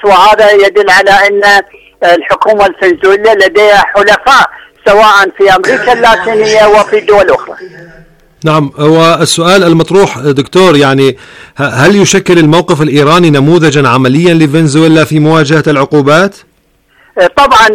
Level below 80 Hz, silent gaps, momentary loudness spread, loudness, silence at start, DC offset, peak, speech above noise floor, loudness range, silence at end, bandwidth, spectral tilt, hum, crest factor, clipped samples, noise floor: -38 dBFS; none; 6 LU; -6 LUFS; 0 s; under 0.1%; 0 dBFS; 44 dB; 2 LU; 0 s; 16.5 kHz; -5 dB/octave; none; 6 dB; 4%; -50 dBFS